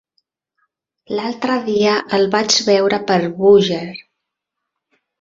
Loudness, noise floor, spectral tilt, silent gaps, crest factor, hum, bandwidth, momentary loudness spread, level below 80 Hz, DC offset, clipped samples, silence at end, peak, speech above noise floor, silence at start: -15 LUFS; -80 dBFS; -4 dB/octave; none; 16 dB; none; 7.8 kHz; 13 LU; -60 dBFS; under 0.1%; under 0.1%; 1.2 s; -2 dBFS; 64 dB; 1.1 s